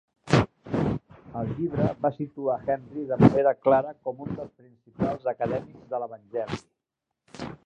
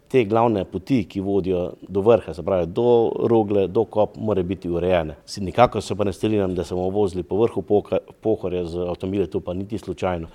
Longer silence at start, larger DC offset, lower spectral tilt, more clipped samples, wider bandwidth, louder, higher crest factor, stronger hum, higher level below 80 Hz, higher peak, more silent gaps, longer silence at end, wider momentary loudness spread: about the same, 0.25 s vs 0.15 s; neither; about the same, -8 dB/octave vs -7.5 dB/octave; neither; second, 10 kHz vs 12 kHz; second, -27 LUFS vs -22 LUFS; about the same, 24 dB vs 22 dB; neither; about the same, -50 dBFS vs -48 dBFS; second, -4 dBFS vs 0 dBFS; neither; about the same, 0.1 s vs 0.05 s; first, 15 LU vs 8 LU